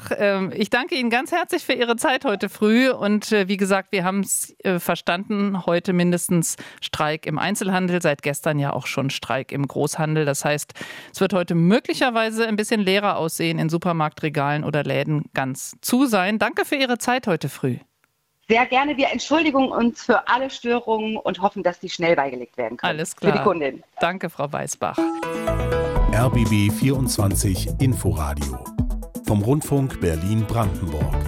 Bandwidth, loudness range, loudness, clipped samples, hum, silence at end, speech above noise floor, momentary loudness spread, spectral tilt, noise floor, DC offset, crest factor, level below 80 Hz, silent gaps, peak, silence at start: 16.5 kHz; 3 LU; -22 LUFS; under 0.1%; none; 0 s; 46 dB; 7 LU; -5 dB/octave; -68 dBFS; under 0.1%; 18 dB; -36 dBFS; none; -2 dBFS; 0 s